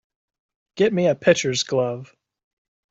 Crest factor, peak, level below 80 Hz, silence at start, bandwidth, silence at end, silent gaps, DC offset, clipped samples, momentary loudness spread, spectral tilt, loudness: 20 dB; -4 dBFS; -62 dBFS; 0.75 s; 7.8 kHz; 0.85 s; none; under 0.1%; under 0.1%; 8 LU; -4.5 dB/octave; -20 LUFS